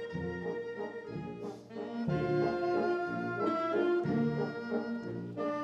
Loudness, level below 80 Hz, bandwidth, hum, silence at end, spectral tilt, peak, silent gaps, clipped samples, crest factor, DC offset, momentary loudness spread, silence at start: -34 LUFS; -64 dBFS; 7.4 kHz; none; 0 s; -8.5 dB/octave; -20 dBFS; none; under 0.1%; 14 dB; under 0.1%; 11 LU; 0 s